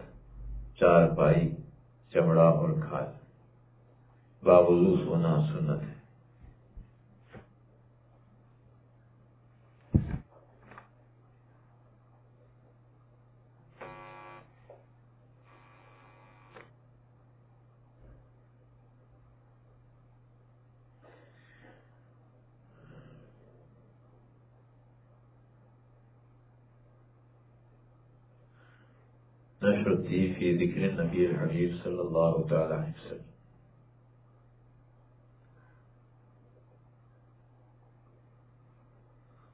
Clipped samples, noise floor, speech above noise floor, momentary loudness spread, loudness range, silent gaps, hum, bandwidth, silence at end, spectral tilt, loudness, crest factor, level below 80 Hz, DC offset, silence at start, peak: under 0.1%; -60 dBFS; 35 dB; 27 LU; 26 LU; none; none; 4 kHz; 6.3 s; -8 dB/octave; -27 LUFS; 24 dB; -54 dBFS; under 0.1%; 0 s; -8 dBFS